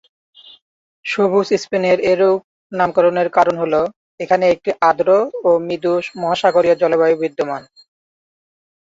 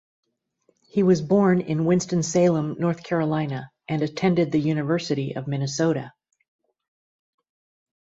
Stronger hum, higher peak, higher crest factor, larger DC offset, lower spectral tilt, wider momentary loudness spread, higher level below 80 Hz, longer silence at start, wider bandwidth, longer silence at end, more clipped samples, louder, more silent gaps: neither; first, -2 dBFS vs -6 dBFS; about the same, 16 dB vs 18 dB; neither; about the same, -5.5 dB/octave vs -6.5 dB/octave; about the same, 9 LU vs 9 LU; about the same, -60 dBFS vs -60 dBFS; about the same, 1.05 s vs 0.95 s; about the same, 7.8 kHz vs 8 kHz; second, 1.2 s vs 2 s; neither; first, -16 LUFS vs -23 LUFS; first, 2.44-2.70 s, 3.96-4.18 s vs none